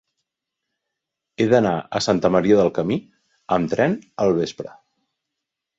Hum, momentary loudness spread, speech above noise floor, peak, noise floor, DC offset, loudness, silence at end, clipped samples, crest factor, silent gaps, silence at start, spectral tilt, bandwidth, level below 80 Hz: none; 10 LU; 63 dB; -2 dBFS; -83 dBFS; under 0.1%; -20 LUFS; 1.1 s; under 0.1%; 20 dB; none; 1.4 s; -6 dB/octave; 8 kHz; -56 dBFS